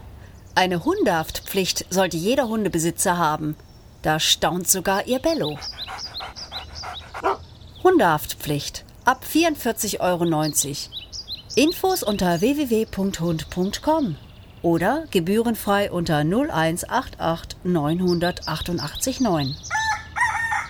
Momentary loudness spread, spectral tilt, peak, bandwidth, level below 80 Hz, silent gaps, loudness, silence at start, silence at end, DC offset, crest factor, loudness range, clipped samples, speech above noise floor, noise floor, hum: 11 LU; -4 dB/octave; -2 dBFS; over 20 kHz; -44 dBFS; none; -22 LUFS; 0 s; 0 s; under 0.1%; 20 dB; 2 LU; under 0.1%; 20 dB; -42 dBFS; none